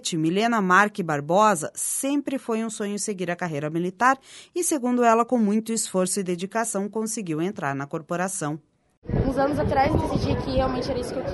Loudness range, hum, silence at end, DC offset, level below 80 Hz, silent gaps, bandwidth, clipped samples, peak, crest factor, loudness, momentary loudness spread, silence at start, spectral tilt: 4 LU; none; 0 s; under 0.1%; -42 dBFS; 8.97-9.02 s; 12 kHz; under 0.1%; -4 dBFS; 20 dB; -24 LUFS; 9 LU; 0.05 s; -4.5 dB/octave